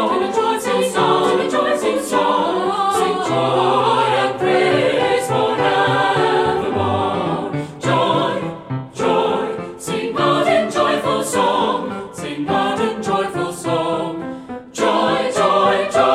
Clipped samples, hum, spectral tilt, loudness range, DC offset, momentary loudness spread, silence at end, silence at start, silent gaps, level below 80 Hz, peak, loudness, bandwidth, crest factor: under 0.1%; none; -4.5 dB/octave; 4 LU; under 0.1%; 9 LU; 0 s; 0 s; none; -54 dBFS; -2 dBFS; -18 LUFS; 15 kHz; 16 dB